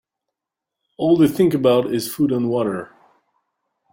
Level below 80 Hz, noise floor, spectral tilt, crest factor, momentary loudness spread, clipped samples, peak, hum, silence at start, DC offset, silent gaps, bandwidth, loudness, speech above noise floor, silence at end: -58 dBFS; -84 dBFS; -6.5 dB/octave; 18 dB; 9 LU; under 0.1%; -4 dBFS; none; 1 s; under 0.1%; none; 17 kHz; -18 LUFS; 67 dB; 1.05 s